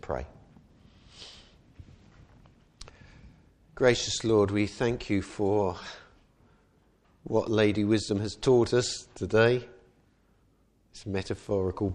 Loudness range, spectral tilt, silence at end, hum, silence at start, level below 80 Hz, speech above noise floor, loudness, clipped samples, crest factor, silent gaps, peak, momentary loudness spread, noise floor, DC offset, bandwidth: 4 LU; -5.5 dB/octave; 0 s; none; 0.05 s; -54 dBFS; 39 dB; -27 LUFS; under 0.1%; 22 dB; none; -8 dBFS; 23 LU; -66 dBFS; under 0.1%; 10.5 kHz